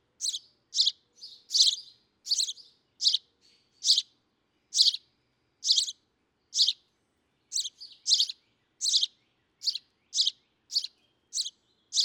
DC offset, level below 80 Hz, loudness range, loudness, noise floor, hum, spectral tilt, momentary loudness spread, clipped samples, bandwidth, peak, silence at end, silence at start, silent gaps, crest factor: under 0.1%; -88 dBFS; 3 LU; -27 LUFS; -74 dBFS; none; 5.5 dB/octave; 17 LU; under 0.1%; 17.5 kHz; -8 dBFS; 0 s; 0.2 s; none; 24 dB